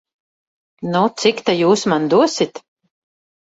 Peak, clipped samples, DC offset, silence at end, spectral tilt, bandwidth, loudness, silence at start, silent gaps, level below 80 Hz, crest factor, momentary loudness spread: -2 dBFS; under 0.1%; under 0.1%; 0.85 s; -4.5 dB/octave; 8 kHz; -16 LUFS; 0.8 s; none; -62 dBFS; 16 dB; 7 LU